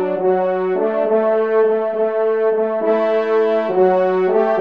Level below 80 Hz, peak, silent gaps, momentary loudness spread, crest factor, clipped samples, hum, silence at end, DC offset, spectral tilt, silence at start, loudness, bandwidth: -70 dBFS; -4 dBFS; none; 3 LU; 12 dB; under 0.1%; none; 0 s; 0.3%; -8.5 dB/octave; 0 s; -17 LUFS; 5.2 kHz